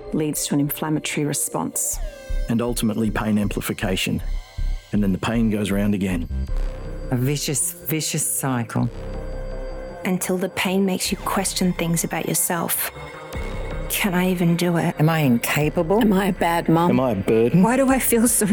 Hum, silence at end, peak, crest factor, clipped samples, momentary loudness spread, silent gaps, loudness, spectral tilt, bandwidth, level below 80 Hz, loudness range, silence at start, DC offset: none; 0 s; -6 dBFS; 14 dB; under 0.1%; 14 LU; none; -21 LUFS; -4.5 dB/octave; over 20 kHz; -32 dBFS; 5 LU; 0 s; under 0.1%